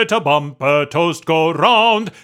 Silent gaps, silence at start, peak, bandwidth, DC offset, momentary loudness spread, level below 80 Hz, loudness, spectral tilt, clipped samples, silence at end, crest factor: none; 0 s; 0 dBFS; 15.5 kHz; under 0.1%; 6 LU; -64 dBFS; -15 LUFS; -4.5 dB/octave; under 0.1%; 0.15 s; 14 dB